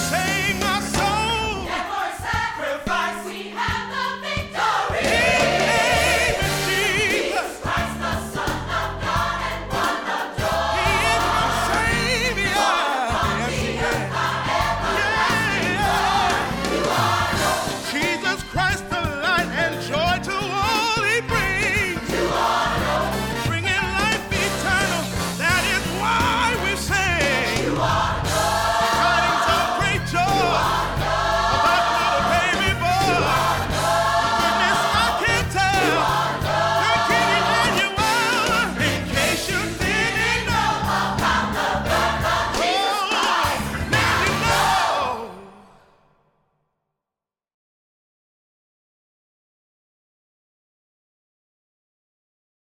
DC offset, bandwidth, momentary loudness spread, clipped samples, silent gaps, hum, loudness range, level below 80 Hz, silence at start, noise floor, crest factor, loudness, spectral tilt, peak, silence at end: under 0.1%; 19 kHz; 6 LU; under 0.1%; none; none; 4 LU; -38 dBFS; 0 s; -89 dBFS; 14 dB; -20 LUFS; -3.5 dB/octave; -8 dBFS; 7.1 s